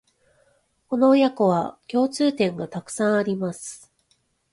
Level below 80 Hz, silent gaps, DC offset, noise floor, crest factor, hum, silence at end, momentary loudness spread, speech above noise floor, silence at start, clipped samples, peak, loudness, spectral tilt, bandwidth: -66 dBFS; none; under 0.1%; -67 dBFS; 16 dB; none; 0.75 s; 14 LU; 46 dB; 0.9 s; under 0.1%; -8 dBFS; -22 LUFS; -5.5 dB/octave; 11.5 kHz